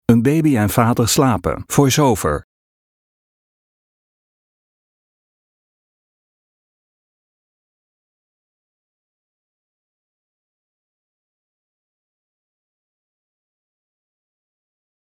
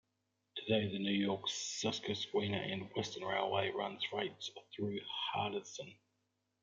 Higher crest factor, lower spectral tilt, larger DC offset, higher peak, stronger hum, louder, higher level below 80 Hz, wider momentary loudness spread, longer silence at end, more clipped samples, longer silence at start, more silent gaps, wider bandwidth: about the same, 22 dB vs 20 dB; first, -5.5 dB/octave vs -4 dB/octave; neither; first, 0 dBFS vs -20 dBFS; neither; first, -16 LUFS vs -38 LUFS; first, -46 dBFS vs -80 dBFS; second, 7 LU vs 11 LU; first, 12.65 s vs 0.7 s; neither; second, 0.1 s vs 0.55 s; neither; first, 18 kHz vs 9.4 kHz